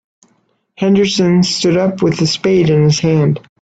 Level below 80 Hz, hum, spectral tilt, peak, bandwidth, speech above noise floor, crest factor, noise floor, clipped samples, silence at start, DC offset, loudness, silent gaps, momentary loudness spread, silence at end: -48 dBFS; none; -6 dB/octave; -2 dBFS; 8.4 kHz; 48 dB; 12 dB; -60 dBFS; under 0.1%; 0.8 s; under 0.1%; -13 LUFS; none; 3 LU; 0.2 s